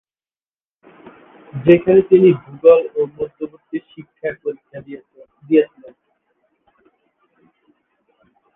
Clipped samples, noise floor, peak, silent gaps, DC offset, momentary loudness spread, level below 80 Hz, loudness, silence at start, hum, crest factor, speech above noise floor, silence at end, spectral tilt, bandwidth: under 0.1%; under -90 dBFS; 0 dBFS; none; under 0.1%; 23 LU; -58 dBFS; -16 LUFS; 1.55 s; none; 18 dB; over 74 dB; 2.9 s; -10.5 dB/octave; 3.8 kHz